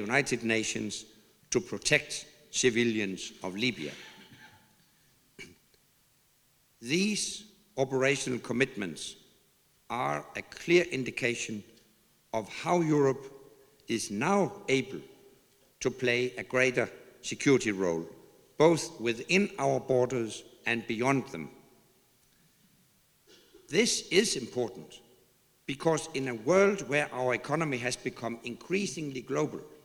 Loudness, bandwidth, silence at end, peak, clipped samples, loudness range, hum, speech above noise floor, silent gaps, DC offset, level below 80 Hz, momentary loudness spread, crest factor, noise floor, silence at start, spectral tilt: -30 LUFS; over 20 kHz; 0.1 s; -8 dBFS; under 0.1%; 7 LU; none; 38 dB; none; under 0.1%; -66 dBFS; 15 LU; 22 dB; -67 dBFS; 0 s; -4 dB/octave